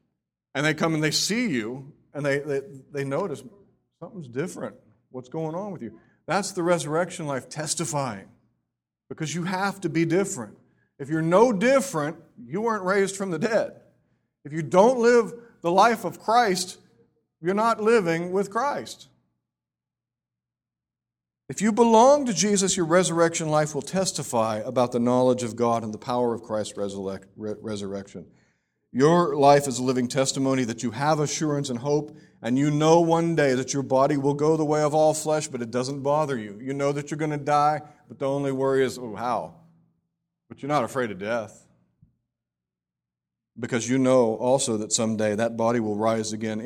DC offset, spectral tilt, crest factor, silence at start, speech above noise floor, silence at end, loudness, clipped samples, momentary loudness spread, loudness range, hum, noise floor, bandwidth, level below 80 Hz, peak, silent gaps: under 0.1%; -5 dB/octave; 22 dB; 0.55 s; 66 dB; 0 s; -24 LUFS; under 0.1%; 15 LU; 9 LU; none; -90 dBFS; 17 kHz; -64 dBFS; -4 dBFS; none